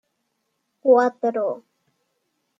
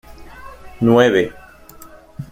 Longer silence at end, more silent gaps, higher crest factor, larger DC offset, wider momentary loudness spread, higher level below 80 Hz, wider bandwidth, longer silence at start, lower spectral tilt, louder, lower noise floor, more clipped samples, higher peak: first, 1 s vs 0.05 s; neither; about the same, 20 dB vs 18 dB; neither; second, 11 LU vs 26 LU; second, -82 dBFS vs -46 dBFS; second, 7.4 kHz vs 16 kHz; first, 0.85 s vs 0.1 s; about the same, -6 dB/octave vs -6.5 dB/octave; second, -20 LUFS vs -15 LUFS; first, -74 dBFS vs -41 dBFS; neither; about the same, -4 dBFS vs -2 dBFS